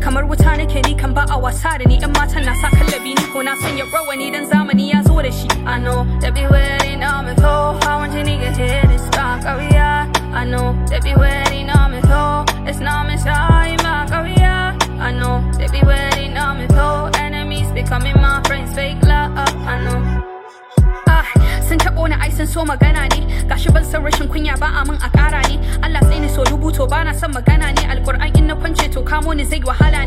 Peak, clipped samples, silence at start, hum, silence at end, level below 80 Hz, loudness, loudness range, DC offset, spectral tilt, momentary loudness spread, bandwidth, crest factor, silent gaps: 0 dBFS; under 0.1%; 0 s; none; 0 s; -18 dBFS; -16 LUFS; 1 LU; under 0.1%; -5.5 dB/octave; 6 LU; 15.5 kHz; 14 dB; none